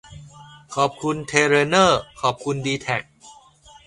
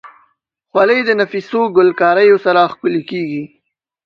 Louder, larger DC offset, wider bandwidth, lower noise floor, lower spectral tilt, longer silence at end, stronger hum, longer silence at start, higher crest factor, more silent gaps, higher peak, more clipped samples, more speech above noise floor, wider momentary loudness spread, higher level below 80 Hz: second, -20 LUFS vs -13 LUFS; neither; first, 11.5 kHz vs 6.4 kHz; second, -49 dBFS vs -62 dBFS; second, -4 dB/octave vs -7 dB/octave; about the same, 0.55 s vs 0.6 s; neither; about the same, 0.1 s vs 0.05 s; first, 20 dB vs 14 dB; neither; about the same, -2 dBFS vs 0 dBFS; neither; second, 29 dB vs 49 dB; about the same, 10 LU vs 11 LU; first, -54 dBFS vs -64 dBFS